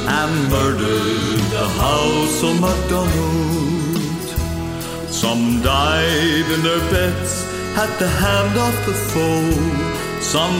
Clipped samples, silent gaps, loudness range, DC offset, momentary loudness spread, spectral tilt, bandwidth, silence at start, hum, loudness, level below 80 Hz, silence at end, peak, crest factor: under 0.1%; none; 2 LU; under 0.1%; 6 LU; -4.5 dB/octave; 16.5 kHz; 0 s; none; -18 LUFS; -30 dBFS; 0 s; -4 dBFS; 14 dB